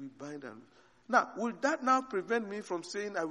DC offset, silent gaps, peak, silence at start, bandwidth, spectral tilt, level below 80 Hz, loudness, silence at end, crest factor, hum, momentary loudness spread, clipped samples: under 0.1%; none; -12 dBFS; 0 s; 11 kHz; -4 dB/octave; -82 dBFS; -32 LUFS; 0 s; 22 dB; none; 15 LU; under 0.1%